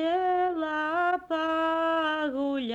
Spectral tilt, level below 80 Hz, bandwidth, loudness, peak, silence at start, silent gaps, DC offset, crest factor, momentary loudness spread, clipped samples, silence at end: -4.5 dB/octave; -64 dBFS; 8.2 kHz; -27 LUFS; -16 dBFS; 0 s; none; under 0.1%; 12 dB; 3 LU; under 0.1%; 0 s